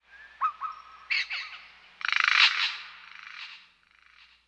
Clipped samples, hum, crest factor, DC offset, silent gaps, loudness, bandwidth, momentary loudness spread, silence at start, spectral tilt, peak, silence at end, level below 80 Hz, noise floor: under 0.1%; none; 24 dB; under 0.1%; none; -25 LUFS; 11 kHz; 24 LU; 0.15 s; 4 dB/octave; -6 dBFS; 0.9 s; -76 dBFS; -61 dBFS